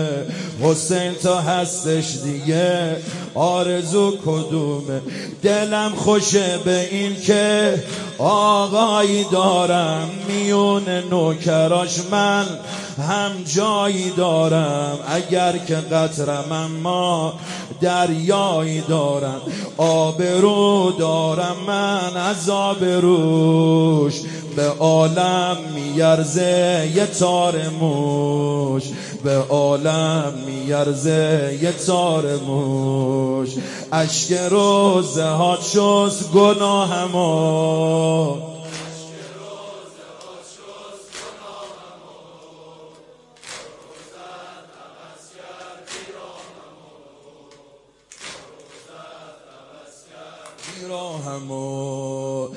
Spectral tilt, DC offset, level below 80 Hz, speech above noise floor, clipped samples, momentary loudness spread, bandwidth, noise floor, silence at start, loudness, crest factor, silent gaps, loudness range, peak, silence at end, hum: -5 dB/octave; under 0.1%; -64 dBFS; 34 dB; under 0.1%; 19 LU; 11.5 kHz; -52 dBFS; 0 s; -19 LUFS; 18 dB; none; 21 LU; -2 dBFS; 0 s; none